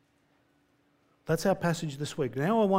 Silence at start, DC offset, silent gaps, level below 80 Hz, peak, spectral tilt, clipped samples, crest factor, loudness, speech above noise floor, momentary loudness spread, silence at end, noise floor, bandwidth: 1.25 s; under 0.1%; none; -62 dBFS; -12 dBFS; -6 dB/octave; under 0.1%; 18 dB; -30 LUFS; 41 dB; 8 LU; 0 s; -69 dBFS; 16 kHz